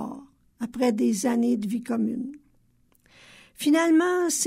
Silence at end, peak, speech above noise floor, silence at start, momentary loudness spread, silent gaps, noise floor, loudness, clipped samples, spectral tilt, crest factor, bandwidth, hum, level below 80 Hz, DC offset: 0 s; -10 dBFS; 40 dB; 0 s; 17 LU; none; -63 dBFS; -24 LUFS; under 0.1%; -4 dB/octave; 16 dB; 16 kHz; none; -66 dBFS; under 0.1%